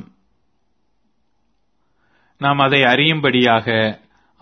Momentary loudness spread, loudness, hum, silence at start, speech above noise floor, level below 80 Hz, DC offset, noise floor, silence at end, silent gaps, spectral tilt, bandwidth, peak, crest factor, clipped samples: 9 LU; -15 LUFS; none; 2.4 s; 54 dB; -58 dBFS; under 0.1%; -69 dBFS; 0.45 s; none; -6.5 dB/octave; 6.4 kHz; 0 dBFS; 20 dB; under 0.1%